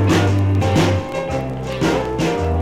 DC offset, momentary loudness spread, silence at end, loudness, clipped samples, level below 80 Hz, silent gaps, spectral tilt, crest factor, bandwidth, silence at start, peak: under 0.1%; 7 LU; 0 s; -18 LUFS; under 0.1%; -34 dBFS; none; -6.5 dB/octave; 12 dB; 13.5 kHz; 0 s; -4 dBFS